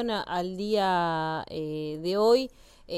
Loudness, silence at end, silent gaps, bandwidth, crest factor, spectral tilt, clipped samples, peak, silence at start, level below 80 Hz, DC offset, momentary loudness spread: -27 LUFS; 0 s; none; 13.5 kHz; 16 dB; -5.5 dB/octave; under 0.1%; -12 dBFS; 0 s; -58 dBFS; under 0.1%; 10 LU